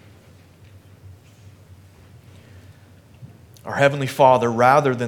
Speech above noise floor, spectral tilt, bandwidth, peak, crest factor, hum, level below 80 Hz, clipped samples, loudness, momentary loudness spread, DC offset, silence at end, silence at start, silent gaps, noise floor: 32 dB; -6 dB/octave; 17.5 kHz; 0 dBFS; 22 dB; none; -62 dBFS; under 0.1%; -17 LUFS; 11 LU; under 0.1%; 0 s; 1.05 s; none; -49 dBFS